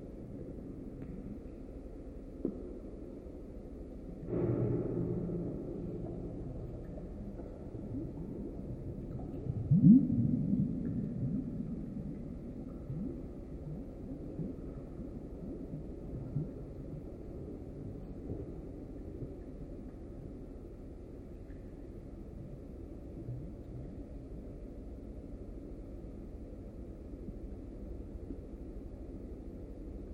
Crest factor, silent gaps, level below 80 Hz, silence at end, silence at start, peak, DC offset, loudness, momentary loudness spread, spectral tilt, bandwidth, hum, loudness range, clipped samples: 26 dB; none; -50 dBFS; 0 s; 0 s; -12 dBFS; under 0.1%; -39 LUFS; 14 LU; -11.5 dB/octave; 5 kHz; none; 17 LU; under 0.1%